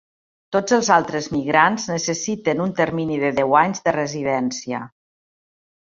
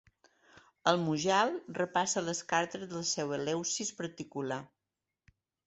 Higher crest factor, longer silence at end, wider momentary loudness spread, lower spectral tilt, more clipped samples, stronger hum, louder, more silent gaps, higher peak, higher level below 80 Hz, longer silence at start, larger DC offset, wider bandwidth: about the same, 20 dB vs 24 dB; about the same, 1 s vs 1 s; about the same, 8 LU vs 10 LU; about the same, -4.5 dB/octave vs -3.5 dB/octave; neither; neither; first, -20 LUFS vs -33 LUFS; neither; first, -2 dBFS vs -10 dBFS; first, -58 dBFS vs -74 dBFS; about the same, 0.5 s vs 0.55 s; neither; about the same, 7.8 kHz vs 8.2 kHz